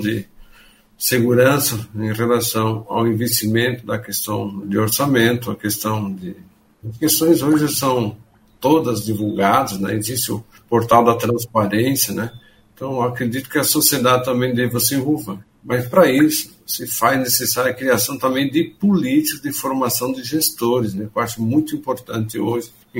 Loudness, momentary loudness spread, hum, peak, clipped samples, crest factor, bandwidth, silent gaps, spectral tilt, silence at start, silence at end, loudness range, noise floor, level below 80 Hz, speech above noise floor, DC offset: -18 LUFS; 11 LU; none; 0 dBFS; under 0.1%; 18 dB; 16.5 kHz; none; -4.5 dB/octave; 0 s; 0 s; 3 LU; -49 dBFS; -54 dBFS; 31 dB; under 0.1%